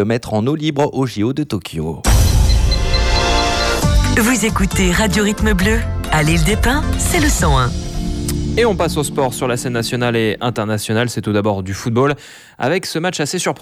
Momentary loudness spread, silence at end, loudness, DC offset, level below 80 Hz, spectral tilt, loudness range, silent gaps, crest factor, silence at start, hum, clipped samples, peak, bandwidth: 6 LU; 0.05 s; -16 LUFS; under 0.1%; -22 dBFS; -4.5 dB/octave; 3 LU; none; 14 dB; 0 s; none; under 0.1%; -2 dBFS; 15.5 kHz